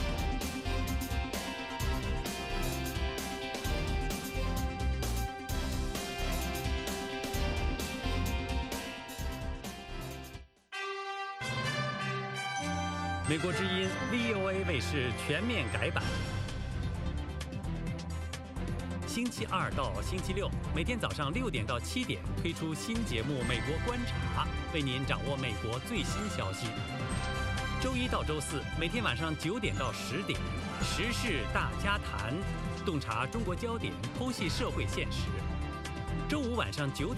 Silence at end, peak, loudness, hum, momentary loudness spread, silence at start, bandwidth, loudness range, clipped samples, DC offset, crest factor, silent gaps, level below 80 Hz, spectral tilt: 0 s; -14 dBFS; -35 LUFS; none; 6 LU; 0 s; 16 kHz; 4 LU; under 0.1%; under 0.1%; 20 dB; none; -40 dBFS; -5 dB/octave